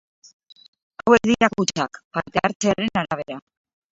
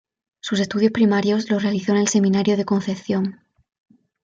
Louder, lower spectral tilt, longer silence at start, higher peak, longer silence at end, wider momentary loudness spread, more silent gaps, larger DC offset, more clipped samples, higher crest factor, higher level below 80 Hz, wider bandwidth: about the same, -21 LUFS vs -20 LUFS; about the same, -4.5 dB/octave vs -5.5 dB/octave; first, 1.05 s vs 0.45 s; first, 0 dBFS vs -6 dBFS; second, 0.55 s vs 0.9 s; first, 12 LU vs 7 LU; first, 2.05-2.11 s, 2.55-2.60 s vs none; neither; neither; first, 22 dB vs 16 dB; first, -54 dBFS vs -62 dBFS; about the same, 8 kHz vs 7.8 kHz